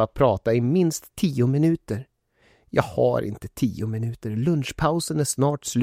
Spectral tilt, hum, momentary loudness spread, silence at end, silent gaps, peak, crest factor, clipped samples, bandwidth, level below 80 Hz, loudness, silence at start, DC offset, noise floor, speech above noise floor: -6 dB/octave; none; 8 LU; 0 s; none; -4 dBFS; 20 dB; under 0.1%; 16 kHz; -48 dBFS; -24 LUFS; 0 s; under 0.1%; -61 dBFS; 39 dB